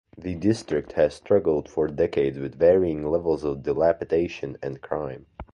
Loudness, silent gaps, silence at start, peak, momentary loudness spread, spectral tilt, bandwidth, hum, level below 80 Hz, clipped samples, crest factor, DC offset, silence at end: -24 LUFS; none; 0.15 s; -8 dBFS; 12 LU; -7.5 dB/octave; 10.5 kHz; none; -48 dBFS; under 0.1%; 16 dB; under 0.1%; 0.1 s